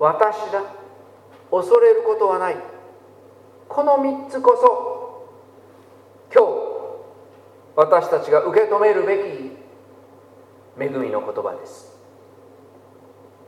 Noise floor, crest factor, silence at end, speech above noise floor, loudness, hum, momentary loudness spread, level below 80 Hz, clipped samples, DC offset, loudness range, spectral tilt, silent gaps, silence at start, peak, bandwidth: -48 dBFS; 20 dB; 1.7 s; 30 dB; -19 LUFS; none; 19 LU; -78 dBFS; under 0.1%; under 0.1%; 11 LU; -6 dB/octave; none; 0 s; 0 dBFS; 10.5 kHz